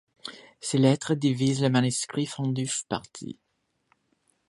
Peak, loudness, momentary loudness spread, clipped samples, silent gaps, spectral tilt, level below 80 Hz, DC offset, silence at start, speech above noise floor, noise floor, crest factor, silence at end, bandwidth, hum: -8 dBFS; -26 LUFS; 18 LU; under 0.1%; none; -5 dB/octave; -66 dBFS; under 0.1%; 0.25 s; 45 dB; -71 dBFS; 20 dB; 1.15 s; 11.5 kHz; none